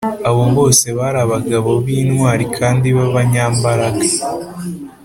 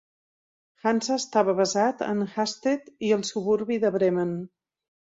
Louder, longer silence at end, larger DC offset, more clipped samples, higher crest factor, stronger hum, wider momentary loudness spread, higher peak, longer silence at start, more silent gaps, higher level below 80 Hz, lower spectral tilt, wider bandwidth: first, -14 LUFS vs -25 LUFS; second, 0.15 s vs 0.6 s; neither; neither; about the same, 14 dB vs 18 dB; neither; first, 9 LU vs 6 LU; first, 0 dBFS vs -8 dBFS; second, 0 s vs 0.85 s; neither; first, -44 dBFS vs -70 dBFS; about the same, -5 dB/octave vs -4.5 dB/octave; first, 16 kHz vs 8 kHz